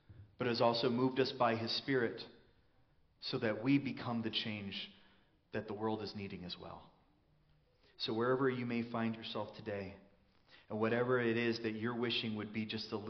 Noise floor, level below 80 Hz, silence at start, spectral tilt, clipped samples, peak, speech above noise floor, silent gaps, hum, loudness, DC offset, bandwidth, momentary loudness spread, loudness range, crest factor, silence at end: -71 dBFS; -74 dBFS; 0.1 s; -4 dB/octave; under 0.1%; -18 dBFS; 34 dB; none; none; -37 LUFS; under 0.1%; 6.4 kHz; 13 LU; 7 LU; 20 dB; 0 s